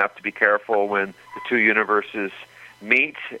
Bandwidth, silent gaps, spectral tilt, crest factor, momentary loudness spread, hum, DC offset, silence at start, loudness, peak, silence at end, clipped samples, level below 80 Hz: 12.5 kHz; none; -5.5 dB/octave; 20 dB; 14 LU; none; under 0.1%; 0 s; -21 LUFS; -2 dBFS; 0 s; under 0.1%; -70 dBFS